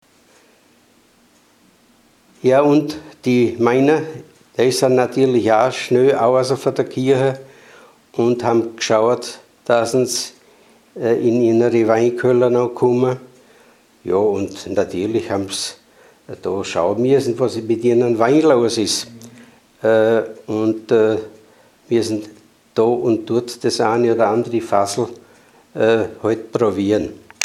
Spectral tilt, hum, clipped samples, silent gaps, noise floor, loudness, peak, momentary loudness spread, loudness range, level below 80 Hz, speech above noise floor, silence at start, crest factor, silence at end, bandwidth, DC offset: -5.5 dB/octave; none; under 0.1%; none; -54 dBFS; -17 LUFS; 0 dBFS; 10 LU; 4 LU; -60 dBFS; 38 dB; 2.45 s; 18 dB; 0 s; 14 kHz; under 0.1%